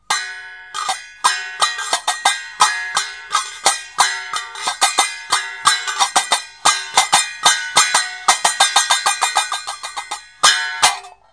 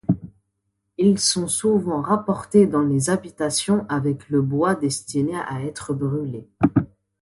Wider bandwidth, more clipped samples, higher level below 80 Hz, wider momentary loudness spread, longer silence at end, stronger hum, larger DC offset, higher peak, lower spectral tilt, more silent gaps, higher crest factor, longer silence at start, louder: about the same, 11 kHz vs 12 kHz; neither; second, -62 dBFS vs -52 dBFS; about the same, 11 LU vs 10 LU; second, 0.2 s vs 0.35 s; neither; first, 0.1% vs under 0.1%; about the same, 0 dBFS vs -2 dBFS; second, 2.5 dB/octave vs -5 dB/octave; neither; about the same, 18 dB vs 18 dB; about the same, 0.1 s vs 0.1 s; first, -16 LUFS vs -21 LUFS